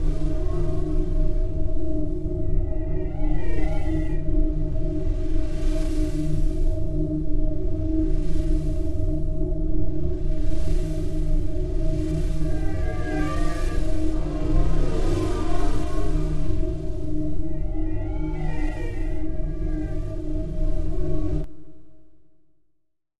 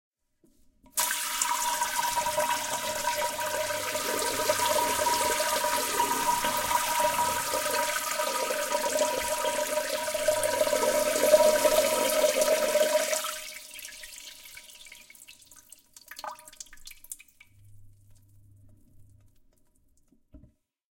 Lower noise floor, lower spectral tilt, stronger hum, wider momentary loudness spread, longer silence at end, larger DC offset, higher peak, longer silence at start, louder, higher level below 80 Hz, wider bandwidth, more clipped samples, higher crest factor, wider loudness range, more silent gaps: first, -70 dBFS vs -66 dBFS; first, -8 dB/octave vs -0.5 dB/octave; neither; second, 4 LU vs 19 LU; second, 0 s vs 0.6 s; neither; about the same, -6 dBFS vs -8 dBFS; second, 0 s vs 0.95 s; about the same, -28 LUFS vs -26 LUFS; first, -24 dBFS vs -58 dBFS; second, 8.4 kHz vs 17 kHz; neither; second, 12 dB vs 22 dB; second, 3 LU vs 21 LU; neither